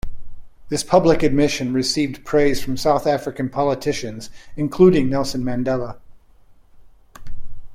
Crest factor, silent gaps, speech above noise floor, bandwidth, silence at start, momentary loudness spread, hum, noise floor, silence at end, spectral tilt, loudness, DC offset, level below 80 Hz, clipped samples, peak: 18 dB; none; 30 dB; 16 kHz; 0.05 s; 12 LU; none; -48 dBFS; 0 s; -5.5 dB/octave; -19 LUFS; under 0.1%; -38 dBFS; under 0.1%; -2 dBFS